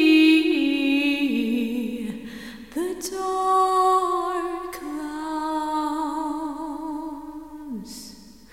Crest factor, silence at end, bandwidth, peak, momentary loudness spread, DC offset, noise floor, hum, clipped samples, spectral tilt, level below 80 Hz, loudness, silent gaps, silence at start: 16 dB; 0.15 s; 16 kHz; -8 dBFS; 17 LU; 0.2%; -45 dBFS; none; under 0.1%; -3.5 dB/octave; -58 dBFS; -23 LUFS; none; 0 s